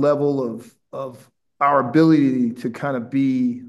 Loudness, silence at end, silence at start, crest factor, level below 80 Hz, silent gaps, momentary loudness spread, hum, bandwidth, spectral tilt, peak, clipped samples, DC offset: -19 LUFS; 0 s; 0 s; 16 dB; -72 dBFS; none; 17 LU; none; 12 kHz; -8.5 dB/octave; -4 dBFS; under 0.1%; under 0.1%